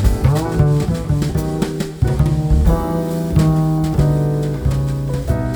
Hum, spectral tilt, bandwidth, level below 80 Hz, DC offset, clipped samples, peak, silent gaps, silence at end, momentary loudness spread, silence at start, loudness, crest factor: none; -8 dB/octave; over 20 kHz; -22 dBFS; under 0.1%; under 0.1%; -2 dBFS; none; 0 s; 5 LU; 0 s; -17 LUFS; 14 dB